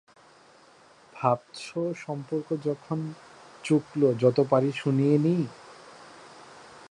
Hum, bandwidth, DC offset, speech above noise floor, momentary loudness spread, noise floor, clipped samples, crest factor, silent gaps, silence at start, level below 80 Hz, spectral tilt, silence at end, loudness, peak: none; 11 kHz; under 0.1%; 30 dB; 25 LU; -56 dBFS; under 0.1%; 20 dB; none; 1.15 s; -72 dBFS; -7.5 dB/octave; 0.05 s; -27 LUFS; -8 dBFS